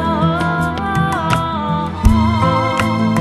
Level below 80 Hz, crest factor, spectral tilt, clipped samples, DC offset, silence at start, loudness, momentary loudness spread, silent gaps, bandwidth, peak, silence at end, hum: -26 dBFS; 16 dB; -6.5 dB/octave; under 0.1%; under 0.1%; 0 s; -16 LUFS; 4 LU; none; 13 kHz; 0 dBFS; 0 s; none